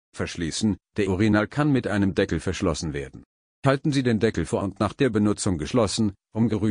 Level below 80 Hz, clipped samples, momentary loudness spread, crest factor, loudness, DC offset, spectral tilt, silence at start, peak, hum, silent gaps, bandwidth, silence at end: -46 dBFS; under 0.1%; 6 LU; 18 dB; -24 LUFS; under 0.1%; -6 dB/octave; 0.15 s; -6 dBFS; none; 3.26-3.62 s; 10 kHz; 0 s